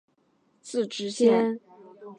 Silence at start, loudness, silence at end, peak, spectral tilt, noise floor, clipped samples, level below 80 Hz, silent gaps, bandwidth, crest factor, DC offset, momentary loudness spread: 0.65 s; -25 LUFS; 0.05 s; -8 dBFS; -5 dB/octave; -68 dBFS; under 0.1%; -84 dBFS; none; 10.5 kHz; 18 dB; under 0.1%; 16 LU